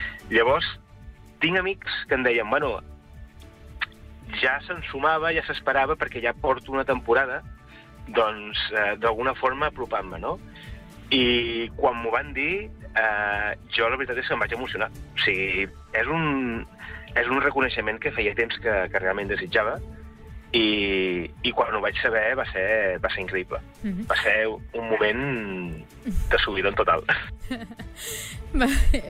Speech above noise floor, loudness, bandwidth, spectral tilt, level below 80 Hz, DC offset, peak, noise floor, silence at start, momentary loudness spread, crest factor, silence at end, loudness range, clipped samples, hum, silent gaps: 22 dB; -24 LUFS; 16 kHz; -4.5 dB/octave; -36 dBFS; under 0.1%; -10 dBFS; -46 dBFS; 0 s; 12 LU; 16 dB; 0 s; 2 LU; under 0.1%; none; none